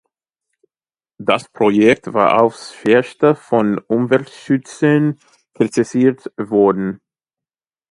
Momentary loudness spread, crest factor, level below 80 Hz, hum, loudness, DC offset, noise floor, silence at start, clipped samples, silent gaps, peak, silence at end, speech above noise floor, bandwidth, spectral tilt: 9 LU; 16 dB; -60 dBFS; none; -16 LUFS; under 0.1%; under -90 dBFS; 1.2 s; under 0.1%; none; 0 dBFS; 0.95 s; over 75 dB; 11.5 kHz; -6.5 dB/octave